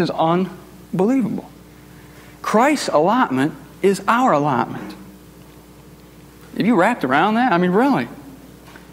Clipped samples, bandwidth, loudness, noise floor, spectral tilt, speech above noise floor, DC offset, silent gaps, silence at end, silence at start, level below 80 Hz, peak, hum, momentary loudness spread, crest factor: under 0.1%; 16 kHz; -18 LUFS; -43 dBFS; -6 dB/octave; 26 dB; under 0.1%; none; 0.15 s; 0 s; -54 dBFS; -2 dBFS; none; 15 LU; 18 dB